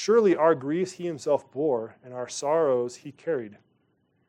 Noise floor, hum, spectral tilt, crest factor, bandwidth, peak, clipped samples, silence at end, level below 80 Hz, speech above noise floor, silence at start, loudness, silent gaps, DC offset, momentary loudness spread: -70 dBFS; none; -5.5 dB/octave; 18 dB; 10.5 kHz; -8 dBFS; under 0.1%; 0.75 s; -80 dBFS; 44 dB; 0 s; -26 LUFS; none; under 0.1%; 15 LU